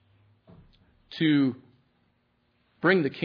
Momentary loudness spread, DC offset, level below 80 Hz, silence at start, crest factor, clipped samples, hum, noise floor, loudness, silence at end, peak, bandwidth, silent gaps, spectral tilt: 19 LU; under 0.1%; -70 dBFS; 1.1 s; 22 dB; under 0.1%; none; -70 dBFS; -25 LUFS; 0 s; -8 dBFS; 5.4 kHz; none; -8.5 dB/octave